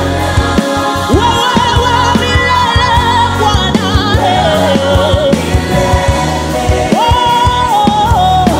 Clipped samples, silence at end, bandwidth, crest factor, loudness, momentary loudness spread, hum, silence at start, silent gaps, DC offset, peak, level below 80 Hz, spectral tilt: under 0.1%; 0 s; 16.5 kHz; 10 dB; -10 LUFS; 3 LU; none; 0 s; none; under 0.1%; 0 dBFS; -20 dBFS; -5 dB/octave